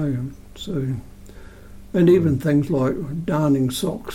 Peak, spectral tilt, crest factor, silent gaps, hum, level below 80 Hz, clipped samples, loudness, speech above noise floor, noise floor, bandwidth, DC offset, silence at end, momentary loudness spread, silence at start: -6 dBFS; -7 dB/octave; 14 dB; none; none; -44 dBFS; under 0.1%; -21 LUFS; 20 dB; -40 dBFS; 16.5 kHz; under 0.1%; 0 s; 13 LU; 0 s